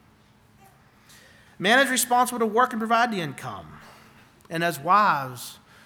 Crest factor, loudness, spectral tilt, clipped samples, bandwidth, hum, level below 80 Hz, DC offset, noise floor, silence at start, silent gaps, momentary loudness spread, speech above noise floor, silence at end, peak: 18 dB; -22 LUFS; -3 dB/octave; under 0.1%; 20 kHz; none; -68 dBFS; under 0.1%; -57 dBFS; 1.6 s; none; 18 LU; 34 dB; 0.3 s; -6 dBFS